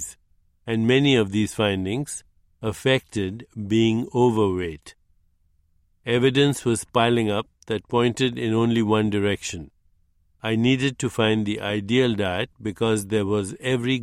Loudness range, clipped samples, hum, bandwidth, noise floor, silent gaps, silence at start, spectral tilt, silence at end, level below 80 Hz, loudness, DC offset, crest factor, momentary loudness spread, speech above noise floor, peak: 2 LU; under 0.1%; none; 15 kHz; -63 dBFS; none; 0 s; -5.5 dB/octave; 0 s; -54 dBFS; -23 LUFS; under 0.1%; 18 dB; 12 LU; 41 dB; -4 dBFS